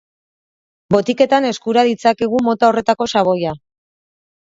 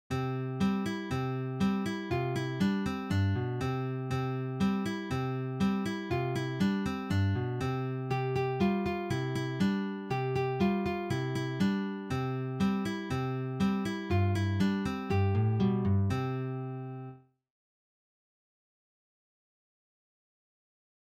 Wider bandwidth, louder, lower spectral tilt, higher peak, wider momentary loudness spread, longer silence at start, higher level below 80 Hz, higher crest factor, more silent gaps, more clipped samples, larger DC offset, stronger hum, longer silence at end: second, 7.8 kHz vs 14.5 kHz; first, -16 LUFS vs -32 LUFS; second, -5.5 dB/octave vs -7.5 dB/octave; first, 0 dBFS vs -18 dBFS; about the same, 4 LU vs 5 LU; first, 0.9 s vs 0.1 s; about the same, -56 dBFS vs -58 dBFS; about the same, 16 dB vs 14 dB; neither; neither; neither; neither; second, 1 s vs 3.9 s